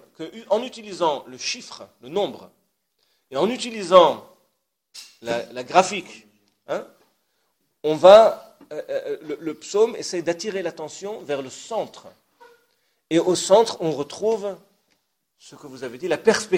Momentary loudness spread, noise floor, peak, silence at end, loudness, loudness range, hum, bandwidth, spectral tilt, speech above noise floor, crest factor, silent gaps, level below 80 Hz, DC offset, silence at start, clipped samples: 21 LU; -73 dBFS; 0 dBFS; 0 s; -21 LUFS; 9 LU; none; 15.5 kHz; -4 dB/octave; 52 dB; 22 dB; none; -68 dBFS; under 0.1%; 0.2 s; under 0.1%